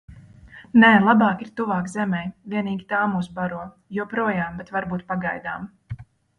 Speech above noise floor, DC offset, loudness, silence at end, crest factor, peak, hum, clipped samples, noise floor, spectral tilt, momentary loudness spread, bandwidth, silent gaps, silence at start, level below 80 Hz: 25 dB; under 0.1%; -22 LUFS; 0.35 s; 20 dB; -2 dBFS; none; under 0.1%; -46 dBFS; -7 dB/octave; 18 LU; 10.5 kHz; none; 0.1 s; -54 dBFS